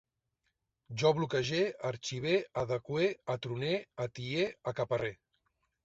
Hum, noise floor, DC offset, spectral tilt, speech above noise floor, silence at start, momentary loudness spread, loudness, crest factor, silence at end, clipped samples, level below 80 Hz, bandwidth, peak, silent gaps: none; -83 dBFS; under 0.1%; -5.5 dB/octave; 49 dB; 0.9 s; 8 LU; -34 LUFS; 20 dB; 0.7 s; under 0.1%; -66 dBFS; 8 kHz; -14 dBFS; none